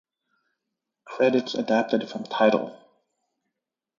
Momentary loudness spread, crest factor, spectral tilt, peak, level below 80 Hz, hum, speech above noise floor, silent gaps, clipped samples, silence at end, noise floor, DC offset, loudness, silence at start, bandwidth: 11 LU; 20 dB; -5.5 dB/octave; -8 dBFS; -76 dBFS; none; 62 dB; none; under 0.1%; 1.25 s; -85 dBFS; under 0.1%; -24 LUFS; 1.05 s; 7.2 kHz